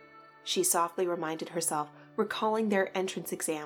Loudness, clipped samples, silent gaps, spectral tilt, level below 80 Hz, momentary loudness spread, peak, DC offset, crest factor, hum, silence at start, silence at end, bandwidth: -31 LUFS; under 0.1%; none; -3 dB/octave; -80 dBFS; 8 LU; -16 dBFS; under 0.1%; 16 dB; none; 0 s; 0 s; 19 kHz